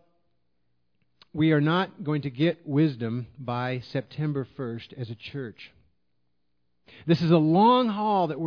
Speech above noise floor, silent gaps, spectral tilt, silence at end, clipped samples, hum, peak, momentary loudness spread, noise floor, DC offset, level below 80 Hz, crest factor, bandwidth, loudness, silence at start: 53 dB; none; -9 dB/octave; 0 s; under 0.1%; 60 Hz at -55 dBFS; -8 dBFS; 17 LU; -78 dBFS; under 0.1%; -64 dBFS; 18 dB; 5.4 kHz; -25 LUFS; 1.35 s